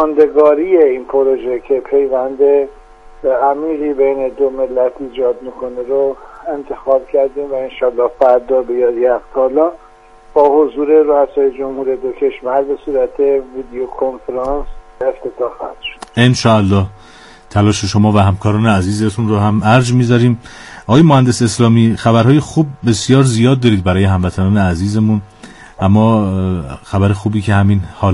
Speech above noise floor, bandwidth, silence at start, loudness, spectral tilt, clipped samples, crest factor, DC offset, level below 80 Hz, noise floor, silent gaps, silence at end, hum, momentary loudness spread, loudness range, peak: 28 dB; 11.5 kHz; 0 s; -13 LUFS; -7 dB/octave; under 0.1%; 12 dB; under 0.1%; -38 dBFS; -41 dBFS; none; 0 s; none; 11 LU; 6 LU; 0 dBFS